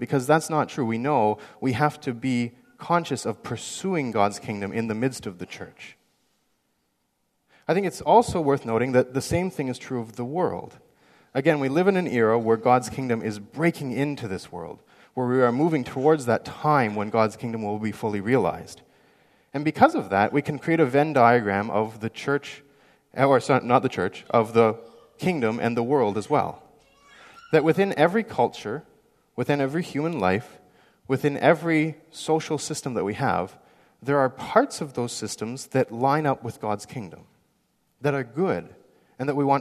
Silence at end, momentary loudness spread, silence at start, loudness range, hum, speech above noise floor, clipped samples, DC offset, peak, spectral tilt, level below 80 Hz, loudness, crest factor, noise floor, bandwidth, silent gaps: 0 s; 13 LU; 0 s; 5 LU; none; 49 dB; under 0.1%; under 0.1%; -2 dBFS; -6 dB/octave; -60 dBFS; -24 LUFS; 22 dB; -73 dBFS; 14 kHz; none